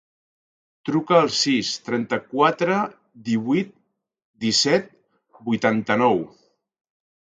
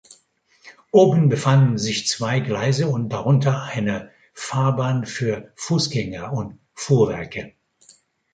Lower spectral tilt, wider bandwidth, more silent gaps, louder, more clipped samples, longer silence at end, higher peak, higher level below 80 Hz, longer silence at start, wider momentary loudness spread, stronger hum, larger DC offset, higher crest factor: second, -4 dB/octave vs -6 dB/octave; about the same, 9.4 kHz vs 9.2 kHz; first, 4.25-4.34 s vs none; about the same, -21 LUFS vs -20 LUFS; neither; first, 1.15 s vs 0.85 s; about the same, -2 dBFS vs -2 dBFS; second, -66 dBFS vs -54 dBFS; first, 0.85 s vs 0.65 s; about the same, 12 LU vs 13 LU; neither; neither; about the same, 22 dB vs 18 dB